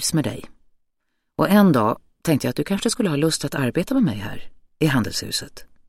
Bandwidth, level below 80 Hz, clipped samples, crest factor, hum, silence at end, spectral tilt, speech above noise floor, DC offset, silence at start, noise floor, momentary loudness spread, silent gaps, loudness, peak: 16.5 kHz; -48 dBFS; under 0.1%; 18 dB; none; 0.25 s; -5 dB/octave; 52 dB; under 0.1%; 0 s; -72 dBFS; 16 LU; none; -21 LUFS; -2 dBFS